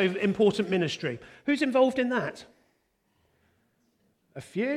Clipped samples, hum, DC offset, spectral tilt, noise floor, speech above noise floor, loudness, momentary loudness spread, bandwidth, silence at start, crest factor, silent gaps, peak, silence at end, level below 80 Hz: under 0.1%; none; under 0.1%; -6 dB/octave; -72 dBFS; 46 dB; -27 LUFS; 16 LU; 12.5 kHz; 0 s; 18 dB; none; -10 dBFS; 0 s; -68 dBFS